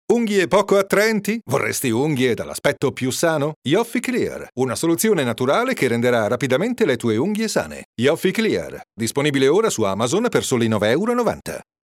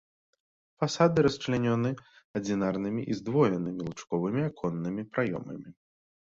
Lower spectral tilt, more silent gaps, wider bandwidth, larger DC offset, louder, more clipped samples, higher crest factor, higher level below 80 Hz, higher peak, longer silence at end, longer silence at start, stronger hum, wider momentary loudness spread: second, -4.5 dB/octave vs -6.5 dB/octave; about the same, 3.56-3.62 s, 7.85-7.93 s vs 2.25-2.34 s; first, 17 kHz vs 7.8 kHz; neither; first, -19 LUFS vs -29 LUFS; neither; about the same, 16 dB vs 20 dB; about the same, -56 dBFS vs -60 dBFS; first, -4 dBFS vs -10 dBFS; second, 0.2 s vs 0.5 s; second, 0.1 s vs 0.8 s; neither; second, 6 LU vs 12 LU